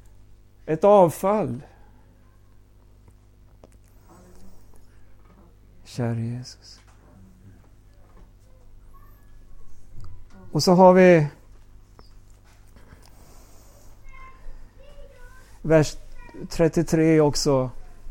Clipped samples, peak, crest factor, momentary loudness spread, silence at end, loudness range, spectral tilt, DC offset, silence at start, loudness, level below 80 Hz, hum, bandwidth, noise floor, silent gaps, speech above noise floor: under 0.1%; -4 dBFS; 22 dB; 22 LU; 0 s; 15 LU; -6 dB/octave; under 0.1%; 0.65 s; -20 LUFS; -44 dBFS; 50 Hz at -55 dBFS; 16.5 kHz; -52 dBFS; none; 33 dB